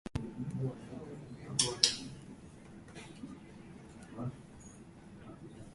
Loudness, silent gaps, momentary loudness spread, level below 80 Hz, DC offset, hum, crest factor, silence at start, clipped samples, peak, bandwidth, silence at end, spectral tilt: -35 LUFS; none; 24 LU; -60 dBFS; under 0.1%; none; 36 dB; 0.05 s; under 0.1%; -4 dBFS; 11.5 kHz; 0 s; -3 dB/octave